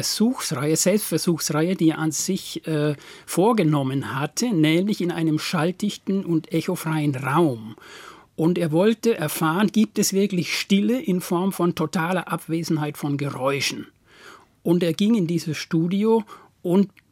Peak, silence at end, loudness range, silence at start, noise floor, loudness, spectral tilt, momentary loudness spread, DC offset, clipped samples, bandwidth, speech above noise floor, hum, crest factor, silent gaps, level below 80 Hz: -6 dBFS; 0.25 s; 3 LU; 0 s; -48 dBFS; -22 LUFS; -5 dB/octave; 7 LU; under 0.1%; under 0.1%; 16.5 kHz; 26 dB; none; 16 dB; none; -66 dBFS